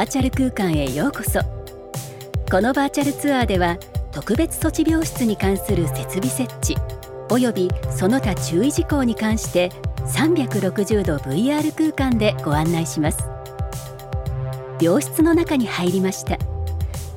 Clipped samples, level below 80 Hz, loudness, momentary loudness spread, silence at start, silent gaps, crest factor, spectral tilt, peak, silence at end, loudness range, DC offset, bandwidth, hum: under 0.1%; -32 dBFS; -21 LUFS; 11 LU; 0 s; none; 16 dB; -5.5 dB/octave; -4 dBFS; 0 s; 2 LU; under 0.1%; 17.5 kHz; none